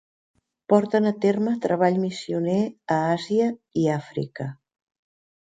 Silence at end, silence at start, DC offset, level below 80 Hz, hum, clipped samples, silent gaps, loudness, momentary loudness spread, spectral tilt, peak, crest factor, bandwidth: 0.95 s; 0.7 s; under 0.1%; -66 dBFS; none; under 0.1%; none; -23 LUFS; 9 LU; -7 dB/octave; -4 dBFS; 20 dB; 9.2 kHz